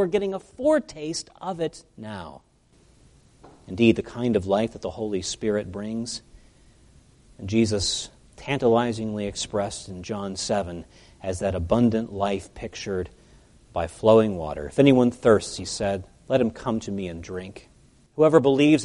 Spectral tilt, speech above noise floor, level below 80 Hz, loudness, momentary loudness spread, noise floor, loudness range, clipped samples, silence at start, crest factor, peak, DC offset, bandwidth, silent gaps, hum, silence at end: -5.5 dB/octave; 34 dB; -50 dBFS; -24 LUFS; 18 LU; -58 dBFS; 7 LU; under 0.1%; 0 s; 22 dB; -4 dBFS; under 0.1%; 11.5 kHz; none; none; 0 s